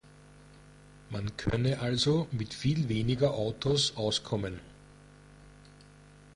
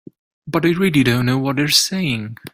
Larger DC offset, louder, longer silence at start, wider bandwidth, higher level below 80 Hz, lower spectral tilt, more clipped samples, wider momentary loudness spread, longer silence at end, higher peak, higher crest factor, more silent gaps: neither; second, -30 LUFS vs -17 LUFS; second, 0.3 s vs 0.45 s; second, 11.5 kHz vs 16 kHz; about the same, -52 dBFS vs -50 dBFS; first, -5.5 dB/octave vs -4 dB/octave; neither; about the same, 10 LU vs 8 LU; first, 0.7 s vs 0.05 s; second, -14 dBFS vs -2 dBFS; about the same, 18 dB vs 18 dB; neither